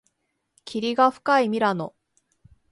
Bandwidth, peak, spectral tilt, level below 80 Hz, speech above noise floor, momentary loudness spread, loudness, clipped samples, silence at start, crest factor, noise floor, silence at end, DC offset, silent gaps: 11.5 kHz; -6 dBFS; -5.5 dB/octave; -68 dBFS; 54 dB; 13 LU; -22 LUFS; under 0.1%; 0.65 s; 20 dB; -75 dBFS; 0.8 s; under 0.1%; none